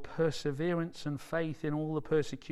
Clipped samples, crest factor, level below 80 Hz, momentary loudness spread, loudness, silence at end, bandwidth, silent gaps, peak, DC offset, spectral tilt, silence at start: under 0.1%; 14 dB; -56 dBFS; 4 LU; -34 LUFS; 0 s; 13 kHz; none; -18 dBFS; under 0.1%; -6.5 dB/octave; 0 s